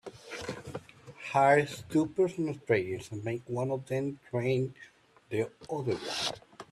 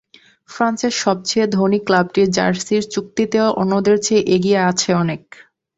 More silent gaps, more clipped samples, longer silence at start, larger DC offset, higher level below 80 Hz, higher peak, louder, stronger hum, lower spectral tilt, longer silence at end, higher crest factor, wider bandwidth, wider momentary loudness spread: neither; neither; second, 0.05 s vs 0.5 s; neither; second, -68 dBFS vs -56 dBFS; second, -12 dBFS vs -2 dBFS; second, -31 LUFS vs -17 LUFS; neither; about the same, -5.5 dB/octave vs -4.5 dB/octave; second, 0.1 s vs 0.6 s; about the same, 20 dB vs 16 dB; first, 13.5 kHz vs 8 kHz; first, 15 LU vs 5 LU